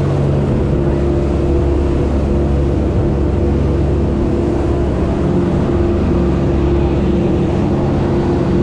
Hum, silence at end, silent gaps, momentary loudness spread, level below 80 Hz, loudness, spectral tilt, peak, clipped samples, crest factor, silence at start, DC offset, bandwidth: none; 0 s; none; 1 LU; -20 dBFS; -15 LUFS; -9 dB/octave; -4 dBFS; under 0.1%; 10 dB; 0 s; under 0.1%; 8.8 kHz